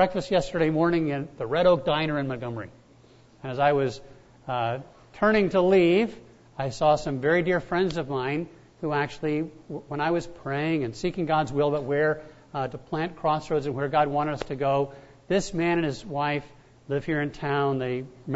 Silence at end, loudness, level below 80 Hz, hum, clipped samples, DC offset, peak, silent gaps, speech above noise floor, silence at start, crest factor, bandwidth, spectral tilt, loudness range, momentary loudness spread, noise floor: 0 s; -26 LUFS; -52 dBFS; none; under 0.1%; under 0.1%; -8 dBFS; none; 29 dB; 0 s; 18 dB; 8 kHz; -6.5 dB/octave; 5 LU; 12 LU; -55 dBFS